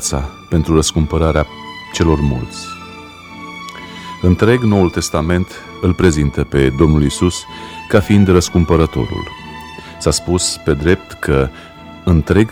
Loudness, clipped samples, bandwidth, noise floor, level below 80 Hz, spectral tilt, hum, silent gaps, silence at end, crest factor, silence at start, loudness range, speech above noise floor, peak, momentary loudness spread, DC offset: -15 LUFS; under 0.1%; 15.5 kHz; -34 dBFS; -26 dBFS; -5.5 dB/octave; none; none; 0 s; 14 dB; 0 s; 4 LU; 20 dB; 0 dBFS; 18 LU; under 0.1%